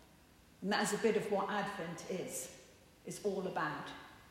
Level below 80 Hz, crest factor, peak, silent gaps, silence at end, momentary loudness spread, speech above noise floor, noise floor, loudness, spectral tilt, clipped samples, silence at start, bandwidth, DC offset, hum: -72 dBFS; 18 dB; -20 dBFS; none; 0 s; 16 LU; 26 dB; -63 dBFS; -38 LUFS; -4 dB/octave; under 0.1%; 0 s; 16 kHz; under 0.1%; none